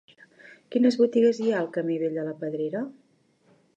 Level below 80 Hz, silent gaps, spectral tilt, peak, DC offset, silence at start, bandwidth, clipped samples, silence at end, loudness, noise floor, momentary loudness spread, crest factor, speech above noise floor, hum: -82 dBFS; none; -6.5 dB/octave; -10 dBFS; under 0.1%; 0.45 s; 8.2 kHz; under 0.1%; 0.85 s; -25 LUFS; -64 dBFS; 11 LU; 18 dB; 40 dB; none